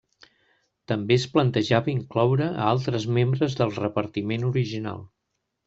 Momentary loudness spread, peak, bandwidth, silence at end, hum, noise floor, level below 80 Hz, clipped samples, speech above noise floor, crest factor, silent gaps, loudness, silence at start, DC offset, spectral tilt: 8 LU; -4 dBFS; 7.8 kHz; 0.6 s; none; -79 dBFS; -60 dBFS; under 0.1%; 55 dB; 20 dB; none; -24 LUFS; 0.9 s; under 0.1%; -7 dB/octave